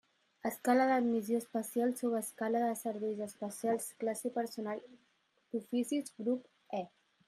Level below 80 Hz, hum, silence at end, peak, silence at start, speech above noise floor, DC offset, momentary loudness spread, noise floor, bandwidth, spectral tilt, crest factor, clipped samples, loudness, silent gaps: -84 dBFS; none; 0.4 s; -18 dBFS; 0.45 s; 40 dB; under 0.1%; 12 LU; -75 dBFS; 15.5 kHz; -4.5 dB/octave; 18 dB; under 0.1%; -36 LUFS; none